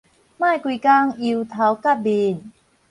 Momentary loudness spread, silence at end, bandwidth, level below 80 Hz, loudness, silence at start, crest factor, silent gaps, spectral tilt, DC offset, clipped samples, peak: 7 LU; 0.4 s; 11 kHz; -66 dBFS; -19 LUFS; 0.4 s; 16 dB; none; -6.5 dB/octave; under 0.1%; under 0.1%; -4 dBFS